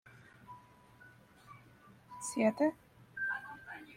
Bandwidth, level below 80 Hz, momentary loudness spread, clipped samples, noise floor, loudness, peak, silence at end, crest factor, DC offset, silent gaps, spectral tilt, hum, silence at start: 15.5 kHz; -76 dBFS; 27 LU; under 0.1%; -61 dBFS; -36 LUFS; -18 dBFS; 0 s; 22 dB; under 0.1%; none; -4.5 dB/octave; none; 0.05 s